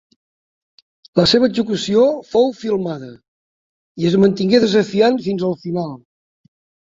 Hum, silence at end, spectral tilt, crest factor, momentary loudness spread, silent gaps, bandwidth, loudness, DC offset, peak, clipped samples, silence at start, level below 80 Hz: none; 0.85 s; -6 dB/octave; 16 dB; 11 LU; 3.28-3.95 s; 7.8 kHz; -16 LUFS; under 0.1%; -2 dBFS; under 0.1%; 1.15 s; -54 dBFS